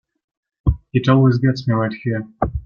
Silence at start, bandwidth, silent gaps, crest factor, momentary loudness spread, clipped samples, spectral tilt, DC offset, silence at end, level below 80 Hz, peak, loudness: 0.65 s; 6.8 kHz; none; 16 dB; 10 LU; under 0.1%; -8.5 dB/octave; under 0.1%; 0.05 s; -32 dBFS; -2 dBFS; -18 LUFS